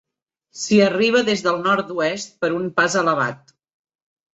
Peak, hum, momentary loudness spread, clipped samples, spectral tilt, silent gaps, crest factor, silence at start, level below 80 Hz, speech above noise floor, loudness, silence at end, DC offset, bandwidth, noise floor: -2 dBFS; none; 8 LU; under 0.1%; -4 dB/octave; none; 18 dB; 0.55 s; -64 dBFS; 53 dB; -19 LUFS; 0.95 s; under 0.1%; 8.2 kHz; -72 dBFS